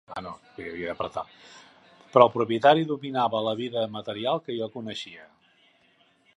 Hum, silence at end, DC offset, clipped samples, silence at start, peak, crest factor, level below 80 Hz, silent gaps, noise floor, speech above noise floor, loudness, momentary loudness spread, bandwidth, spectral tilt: none; 1.1 s; under 0.1%; under 0.1%; 0.1 s; 0 dBFS; 26 dB; -66 dBFS; none; -63 dBFS; 38 dB; -25 LUFS; 18 LU; 10.5 kHz; -6 dB/octave